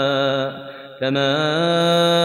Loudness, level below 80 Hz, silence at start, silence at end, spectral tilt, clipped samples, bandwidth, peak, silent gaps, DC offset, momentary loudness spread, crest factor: -19 LUFS; -66 dBFS; 0 s; 0 s; -5 dB/octave; under 0.1%; 14 kHz; -8 dBFS; none; under 0.1%; 13 LU; 12 dB